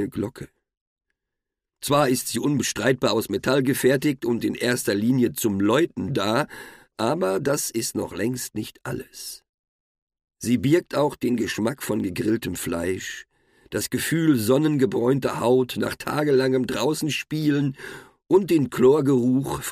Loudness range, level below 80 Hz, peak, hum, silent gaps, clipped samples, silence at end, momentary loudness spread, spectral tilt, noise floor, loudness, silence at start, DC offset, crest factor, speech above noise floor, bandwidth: 5 LU; -56 dBFS; -8 dBFS; none; 0.77-0.96 s, 9.49-10.07 s; under 0.1%; 0 s; 13 LU; -5 dB/octave; -85 dBFS; -23 LUFS; 0 s; under 0.1%; 16 dB; 62 dB; 15.5 kHz